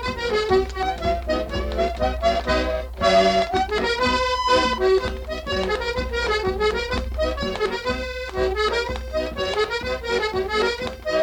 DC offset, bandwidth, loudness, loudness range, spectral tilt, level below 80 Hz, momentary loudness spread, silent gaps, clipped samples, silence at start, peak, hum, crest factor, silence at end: under 0.1%; 18.5 kHz; -22 LUFS; 4 LU; -4.5 dB/octave; -34 dBFS; 7 LU; none; under 0.1%; 0 s; -6 dBFS; none; 16 dB; 0 s